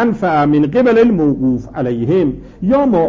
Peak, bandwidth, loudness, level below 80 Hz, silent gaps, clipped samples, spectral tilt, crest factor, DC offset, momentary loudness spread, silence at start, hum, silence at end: -2 dBFS; 7.2 kHz; -14 LUFS; -38 dBFS; none; under 0.1%; -9 dB/octave; 10 dB; under 0.1%; 8 LU; 0 s; none; 0 s